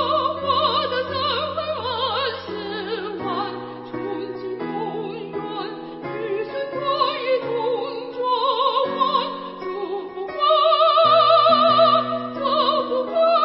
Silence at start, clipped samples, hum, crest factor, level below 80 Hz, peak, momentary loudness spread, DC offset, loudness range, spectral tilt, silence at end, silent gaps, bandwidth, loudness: 0 s; under 0.1%; none; 18 dB; -64 dBFS; -4 dBFS; 15 LU; under 0.1%; 11 LU; -9 dB/octave; 0 s; none; 5.8 kHz; -21 LUFS